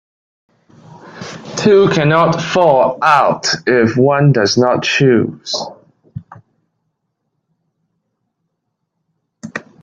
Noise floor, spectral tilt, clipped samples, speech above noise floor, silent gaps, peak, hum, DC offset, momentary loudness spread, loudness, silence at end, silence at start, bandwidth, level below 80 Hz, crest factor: -72 dBFS; -5.5 dB/octave; under 0.1%; 61 dB; none; 0 dBFS; none; under 0.1%; 19 LU; -12 LUFS; 0.25 s; 1.05 s; 9 kHz; -54 dBFS; 16 dB